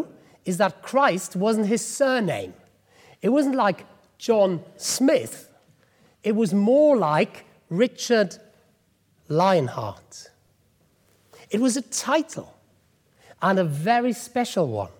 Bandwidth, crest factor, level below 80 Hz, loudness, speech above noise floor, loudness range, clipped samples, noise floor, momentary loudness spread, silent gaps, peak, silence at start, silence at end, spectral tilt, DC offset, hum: 18.5 kHz; 16 dB; -70 dBFS; -23 LUFS; 42 dB; 6 LU; under 0.1%; -64 dBFS; 15 LU; none; -8 dBFS; 0 s; 0.1 s; -5 dB/octave; under 0.1%; none